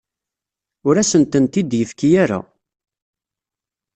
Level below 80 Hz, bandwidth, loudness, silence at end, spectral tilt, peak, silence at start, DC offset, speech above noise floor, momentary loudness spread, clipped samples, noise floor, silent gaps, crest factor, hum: -56 dBFS; 8.8 kHz; -17 LUFS; 1.55 s; -5.5 dB/octave; -2 dBFS; 0.85 s; under 0.1%; 72 dB; 7 LU; under 0.1%; -88 dBFS; none; 18 dB; none